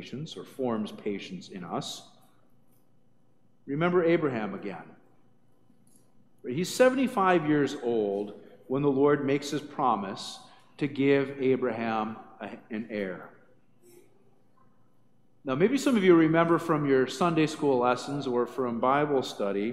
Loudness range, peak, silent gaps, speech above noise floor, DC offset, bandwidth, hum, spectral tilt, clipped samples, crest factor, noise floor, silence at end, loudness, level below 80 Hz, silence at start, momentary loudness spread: 12 LU; -8 dBFS; none; 41 dB; 0.1%; 15 kHz; 60 Hz at -60 dBFS; -6 dB/octave; under 0.1%; 20 dB; -67 dBFS; 0 s; -27 LUFS; -72 dBFS; 0 s; 16 LU